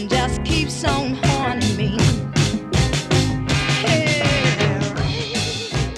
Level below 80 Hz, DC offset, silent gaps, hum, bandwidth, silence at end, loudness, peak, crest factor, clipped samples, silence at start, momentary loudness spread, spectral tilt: -32 dBFS; under 0.1%; none; none; 13 kHz; 0 s; -19 LUFS; -4 dBFS; 16 dB; under 0.1%; 0 s; 5 LU; -4.5 dB/octave